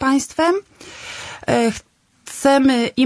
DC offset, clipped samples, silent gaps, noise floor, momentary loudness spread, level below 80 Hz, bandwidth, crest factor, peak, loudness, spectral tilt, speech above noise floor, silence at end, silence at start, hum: under 0.1%; under 0.1%; none; -37 dBFS; 18 LU; -52 dBFS; 11 kHz; 16 dB; -2 dBFS; -18 LUFS; -4 dB/octave; 20 dB; 0 s; 0 s; none